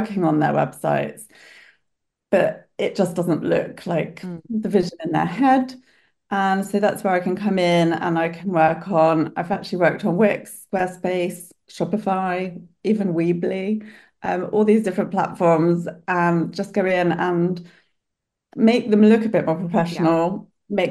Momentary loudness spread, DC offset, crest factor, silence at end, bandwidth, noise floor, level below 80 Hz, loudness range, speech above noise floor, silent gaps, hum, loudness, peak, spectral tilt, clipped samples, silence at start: 10 LU; under 0.1%; 18 dB; 0 s; 12.5 kHz; -81 dBFS; -62 dBFS; 4 LU; 61 dB; none; none; -21 LUFS; -4 dBFS; -7 dB/octave; under 0.1%; 0 s